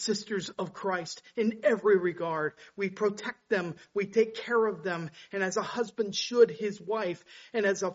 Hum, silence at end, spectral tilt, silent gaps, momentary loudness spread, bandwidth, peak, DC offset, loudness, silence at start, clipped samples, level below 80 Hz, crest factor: none; 0 s; -3.5 dB/octave; none; 11 LU; 8 kHz; -10 dBFS; under 0.1%; -30 LUFS; 0 s; under 0.1%; -76 dBFS; 20 dB